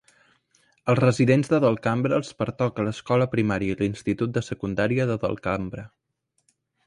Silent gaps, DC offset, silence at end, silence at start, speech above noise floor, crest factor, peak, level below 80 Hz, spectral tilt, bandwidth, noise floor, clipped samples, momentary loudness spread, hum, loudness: none; under 0.1%; 1 s; 0.85 s; 48 dB; 18 dB; -6 dBFS; -52 dBFS; -7 dB/octave; 11 kHz; -71 dBFS; under 0.1%; 10 LU; none; -24 LUFS